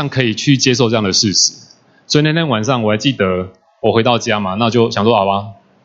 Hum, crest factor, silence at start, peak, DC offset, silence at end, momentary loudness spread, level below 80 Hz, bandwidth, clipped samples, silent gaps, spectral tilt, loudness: none; 14 dB; 0 s; 0 dBFS; under 0.1%; 0.3 s; 6 LU; -54 dBFS; 7.8 kHz; under 0.1%; none; -4 dB/octave; -14 LUFS